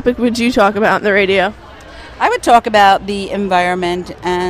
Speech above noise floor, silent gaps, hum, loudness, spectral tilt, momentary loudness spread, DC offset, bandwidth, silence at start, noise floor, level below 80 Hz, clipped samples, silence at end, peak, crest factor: 21 dB; none; none; -13 LUFS; -4.5 dB/octave; 10 LU; under 0.1%; 15 kHz; 0 s; -34 dBFS; -40 dBFS; under 0.1%; 0 s; 0 dBFS; 14 dB